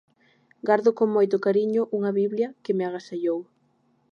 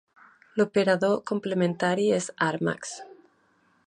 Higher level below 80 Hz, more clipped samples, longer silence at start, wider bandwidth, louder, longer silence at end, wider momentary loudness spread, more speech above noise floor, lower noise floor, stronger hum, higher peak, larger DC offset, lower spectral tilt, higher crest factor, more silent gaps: second, -80 dBFS vs -70 dBFS; neither; about the same, 0.65 s vs 0.55 s; second, 7 kHz vs 11 kHz; about the same, -24 LUFS vs -26 LUFS; about the same, 0.7 s vs 0.8 s; second, 8 LU vs 11 LU; about the same, 43 dB vs 40 dB; about the same, -66 dBFS vs -65 dBFS; neither; first, -6 dBFS vs -10 dBFS; neither; first, -7.5 dB/octave vs -5 dB/octave; about the same, 18 dB vs 18 dB; neither